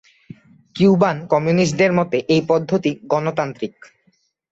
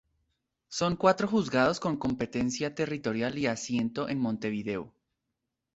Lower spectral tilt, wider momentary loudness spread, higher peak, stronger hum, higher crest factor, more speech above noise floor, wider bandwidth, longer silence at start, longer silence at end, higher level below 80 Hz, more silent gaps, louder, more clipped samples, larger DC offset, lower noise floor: first, -6.5 dB/octave vs -5 dB/octave; about the same, 10 LU vs 8 LU; first, -2 dBFS vs -8 dBFS; neither; second, 16 dB vs 22 dB; second, 46 dB vs 55 dB; about the same, 8 kHz vs 8.2 kHz; about the same, 0.75 s vs 0.7 s; about the same, 0.8 s vs 0.85 s; about the same, -56 dBFS vs -60 dBFS; neither; first, -18 LUFS vs -30 LUFS; neither; neither; second, -63 dBFS vs -85 dBFS